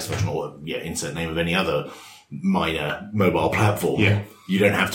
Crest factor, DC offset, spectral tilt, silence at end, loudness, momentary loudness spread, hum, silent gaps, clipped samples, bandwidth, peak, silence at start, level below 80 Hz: 20 dB; under 0.1%; -5.5 dB/octave; 0 s; -23 LUFS; 10 LU; none; none; under 0.1%; 17 kHz; -4 dBFS; 0 s; -48 dBFS